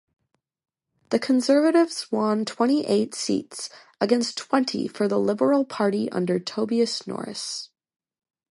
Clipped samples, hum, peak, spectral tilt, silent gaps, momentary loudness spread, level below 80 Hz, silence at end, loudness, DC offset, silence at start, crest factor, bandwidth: under 0.1%; none; -6 dBFS; -4.5 dB/octave; none; 11 LU; -72 dBFS; 0.85 s; -24 LUFS; under 0.1%; 1.1 s; 18 dB; 11.5 kHz